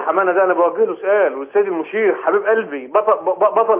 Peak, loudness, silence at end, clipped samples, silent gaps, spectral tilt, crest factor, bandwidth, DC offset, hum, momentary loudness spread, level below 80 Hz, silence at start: -2 dBFS; -17 LUFS; 0 s; under 0.1%; none; -8.5 dB/octave; 14 dB; 3.5 kHz; under 0.1%; none; 4 LU; -76 dBFS; 0 s